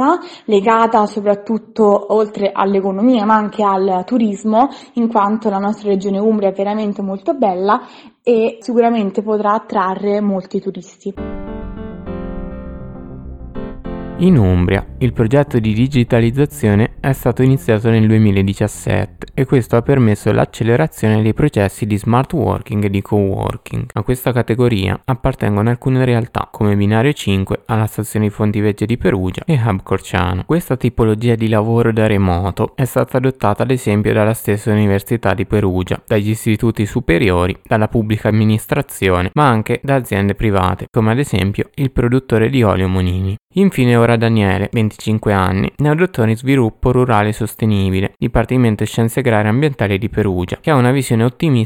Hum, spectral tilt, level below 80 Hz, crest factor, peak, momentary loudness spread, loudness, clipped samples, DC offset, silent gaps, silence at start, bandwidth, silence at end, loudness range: none; -7.5 dB/octave; -36 dBFS; 14 dB; 0 dBFS; 7 LU; -15 LUFS; under 0.1%; under 0.1%; 43.41-43.48 s; 0 s; 16.5 kHz; 0 s; 3 LU